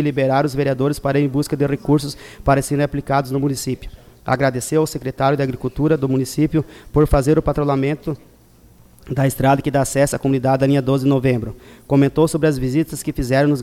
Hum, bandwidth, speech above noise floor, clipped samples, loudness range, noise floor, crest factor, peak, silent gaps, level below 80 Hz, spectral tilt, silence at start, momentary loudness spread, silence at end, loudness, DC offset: none; 15.5 kHz; 31 dB; under 0.1%; 3 LU; -49 dBFS; 14 dB; -4 dBFS; none; -36 dBFS; -6.5 dB/octave; 0 s; 7 LU; 0 s; -18 LUFS; under 0.1%